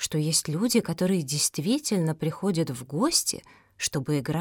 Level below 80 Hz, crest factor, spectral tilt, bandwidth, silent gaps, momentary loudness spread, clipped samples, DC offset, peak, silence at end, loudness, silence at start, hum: -60 dBFS; 18 dB; -4 dB/octave; 19 kHz; none; 6 LU; under 0.1%; under 0.1%; -8 dBFS; 0 s; -26 LUFS; 0 s; none